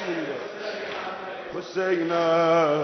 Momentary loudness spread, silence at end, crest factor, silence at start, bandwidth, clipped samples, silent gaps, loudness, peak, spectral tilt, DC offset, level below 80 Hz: 14 LU; 0 s; 14 dB; 0 s; 6.4 kHz; under 0.1%; none; -26 LUFS; -10 dBFS; -5.5 dB/octave; under 0.1%; -68 dBFS